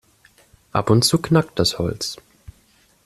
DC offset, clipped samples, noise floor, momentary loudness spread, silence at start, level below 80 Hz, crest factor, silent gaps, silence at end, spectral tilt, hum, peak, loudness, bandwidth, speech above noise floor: under 0.1%; under 0.1%; -58 dBFS; 12 LU; 0.75 s; -48 dBFS; 18 dB; none; 0.9 s; -5 dB/octave; none; -2 dBFS; -19 LUFS; 13.5 kHz; 39 dB